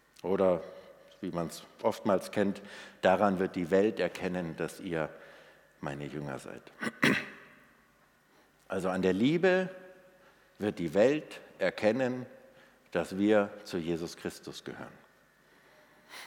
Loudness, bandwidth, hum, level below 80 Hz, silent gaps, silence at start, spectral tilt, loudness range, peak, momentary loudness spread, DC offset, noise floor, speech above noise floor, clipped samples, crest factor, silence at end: -31 LUFS; 18 kHz; none; -68 dBFS; none; 0.25 s; -6 dB/octave; 5 LU; -10 dBFS; 18 LU; under 0.1%; -66 dBFS; 35 dB; under 0.1%; 22 dB; 0 s